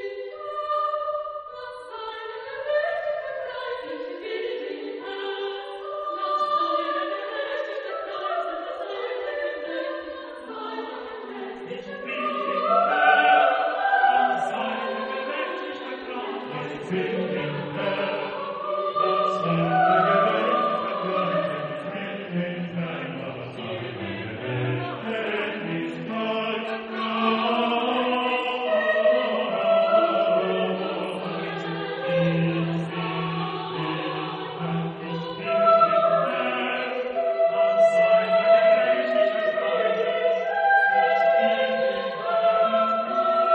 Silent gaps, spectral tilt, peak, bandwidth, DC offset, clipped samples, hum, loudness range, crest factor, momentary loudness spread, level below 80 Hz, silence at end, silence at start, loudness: none; -7 dB/octave; -6 dBFS; 8.6 kHz; under 0.1%; under 0.1%; none; 10 LU; 18 dB; 14 LU; -68 dBFS; 0 s; 0 s; -24 LUFS